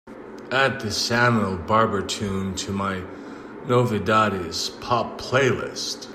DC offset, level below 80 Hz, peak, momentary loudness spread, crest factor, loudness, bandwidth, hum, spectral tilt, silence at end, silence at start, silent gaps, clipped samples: under 0.1%; -54 dBFS; -6 dBFS; 14 LU; 18 dB; -23 LUFS; 15 kHz; none; -4.5 dB/octave; 0 s; 0.05 s; none; under 0.1%